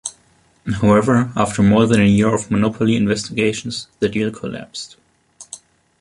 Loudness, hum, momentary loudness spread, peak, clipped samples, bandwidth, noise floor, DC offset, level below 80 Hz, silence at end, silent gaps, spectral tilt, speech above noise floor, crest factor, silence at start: -17 LUFS; none; 19 LU; -2 dBFS; under 0.1%; 11.5 kHz; -56 dBFS; under 0.1%; -44 dBFS; 0.45 s; none; -6 dB/octave; 39 dB; 16 dB; 0.05 s